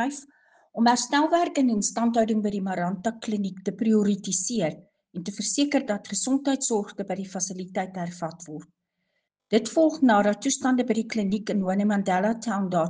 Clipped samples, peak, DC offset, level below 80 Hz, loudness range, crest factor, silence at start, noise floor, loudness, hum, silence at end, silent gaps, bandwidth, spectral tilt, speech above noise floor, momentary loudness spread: under 0.1%; -8 dBFS; under 0.1%; -68 dBFS; 5 LU; 18 dB; 0 s; -78 dBFS; -25 LUFS; none; 0 s; none; 10 kHz; -4.5 dB/octave; 53 dB; 11 LU